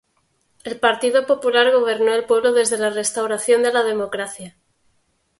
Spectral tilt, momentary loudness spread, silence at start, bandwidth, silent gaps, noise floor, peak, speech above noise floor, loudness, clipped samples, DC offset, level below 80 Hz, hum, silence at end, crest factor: -2 dB/octave; 12 LU; 0.65 s; 12 kHz; none; -66 dBFS; -2 dBFS; 48 dB; -18 LUFS; under 0.1%; under 0.1%; -66 dBFS; none; 0.9 s; 18 dB